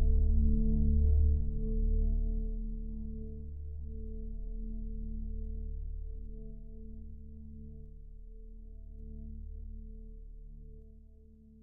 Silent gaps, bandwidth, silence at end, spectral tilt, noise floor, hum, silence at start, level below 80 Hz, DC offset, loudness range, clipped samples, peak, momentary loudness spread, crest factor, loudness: none; 0.9 kHz; 0 s; -18.5 dB/octave; -56 dBFS; none; 0 s; -34 dBFS; under 0.1%; 17 LU; under 0.1%; -16 dBFS; 23 LU; 16 dB; -36 LUFS